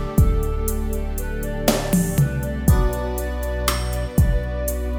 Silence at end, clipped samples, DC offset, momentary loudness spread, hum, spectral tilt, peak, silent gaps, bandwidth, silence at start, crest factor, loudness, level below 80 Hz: 0 s; under 0.1%; under 0.1%; 7 LU; none; -5.5 dB/octave; 0 dBFS; none; over 20 kHz; 0 s; 20 dB; -22 LUFS; -24 dBFS